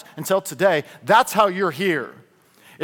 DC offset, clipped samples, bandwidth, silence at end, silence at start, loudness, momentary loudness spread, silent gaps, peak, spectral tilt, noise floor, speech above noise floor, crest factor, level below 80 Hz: under 0.1%; under 0.1%; 18 kHz; 0 s; 0.15 s; -20 LUFS; 8 LU; none; -2 dBFS; -4 dB/octave; -52 dBFS; 32 dB; 20 dB; -64 dBFS